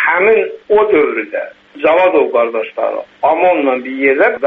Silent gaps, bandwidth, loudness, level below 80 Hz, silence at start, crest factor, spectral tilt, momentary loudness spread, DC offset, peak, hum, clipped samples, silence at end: none; 4.1 kHz; -13 LUFS; -54 dBFS; 0 s; 12 dB; -7 dB/octave; 9 LU; under 0.1%; 0 dBFS; none; under 0.1%; 0 s